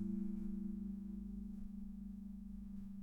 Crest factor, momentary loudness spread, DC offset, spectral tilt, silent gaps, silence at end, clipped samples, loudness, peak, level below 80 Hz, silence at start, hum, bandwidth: 14 dB; 7 LU; under 0.1%; -10.5 dB/octave; none; 0 s; under 0.1%; -48 LUFS; -32 dBFS; -56 dBFS; 0 s; none; 2.5 kHz